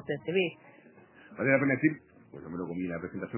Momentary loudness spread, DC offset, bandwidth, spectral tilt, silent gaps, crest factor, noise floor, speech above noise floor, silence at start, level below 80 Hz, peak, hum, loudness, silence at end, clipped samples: 21 LU; under 0.1%; 3.2 kHz; -5 dB/octave; none; 22 dB; -56 dBFS; 26 dB; 0 s; -66 dBFS; -10 dBFS; none; -30 LUFS; 0 s; under 0.1%